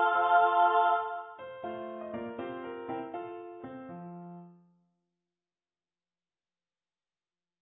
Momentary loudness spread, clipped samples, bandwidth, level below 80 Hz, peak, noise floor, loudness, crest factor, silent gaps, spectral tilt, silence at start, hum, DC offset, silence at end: 21 LU; under 0.1%; 3.8 kHz; -76 dBFS; -12 dBFS; under -90 dBFS; -30 LUFS; 20 dB; none; -8.5 dB/octave; 0 s; none; under 0.1%; 3.1 s